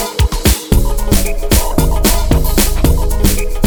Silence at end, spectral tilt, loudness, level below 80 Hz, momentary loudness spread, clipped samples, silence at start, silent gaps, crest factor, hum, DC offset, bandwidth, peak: 0 s; -4.5 dB/octave; -14 LUFS; -14 dBFS; 3 LU; under 0.1%; 0 s; none; 12 dB; none; under 0.1%; over 20 kHz; 0 dBFS